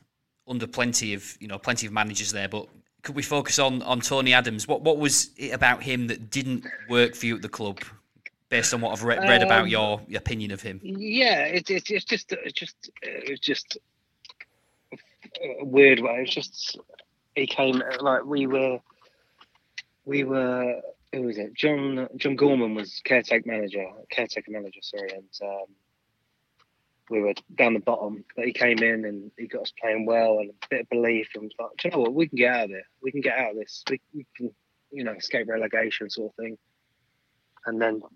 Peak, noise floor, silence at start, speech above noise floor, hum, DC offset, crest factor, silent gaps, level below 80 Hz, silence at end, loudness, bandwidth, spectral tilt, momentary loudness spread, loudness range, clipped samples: -2 dBFS; -74 dBFS; 0.5 s; 48 dB; none; under 0.1%; 26 dB; none; -60 dBFS; 0.1 s; -25 LUFS; 15.5 kHz; -3 dB/octave; 16 LU; 8 LU; under 0.1%